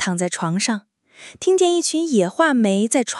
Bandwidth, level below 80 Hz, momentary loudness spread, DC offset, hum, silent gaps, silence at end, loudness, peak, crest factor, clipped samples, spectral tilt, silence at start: 12 kHz; -74 dBFS; 6 LU; under 0.1%; none; none; 0 s; -19 LUFS; -4 dBFS; 16 dB; under 0.1%; -4 dB/octave; 0 s